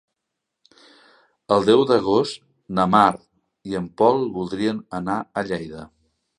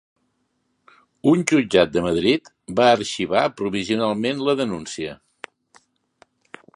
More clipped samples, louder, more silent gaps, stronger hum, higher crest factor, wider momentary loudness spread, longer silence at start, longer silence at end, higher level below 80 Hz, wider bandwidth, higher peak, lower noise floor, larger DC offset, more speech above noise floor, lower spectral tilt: neither; about the same, -21 LUFS vs -20 LUFS; neither; neither; about the same, 22 dB vs 22 dB; first, 18 LU vs 15 LU; first, 1.5 s vs 1.25 s; second, 0.55 s vs 1.6 s; about the same, -56 dBFS vs -54 dBFS; about the same, 10.5 kHz vs 11.5 kHz; about the same, 0 dBFS vs 0 dBFS; first, -81 dBFS vs -70 dBFS; neither; first, 61 dB vs 51 dB; first, -6.5 dB/octave vs -5 dB/octave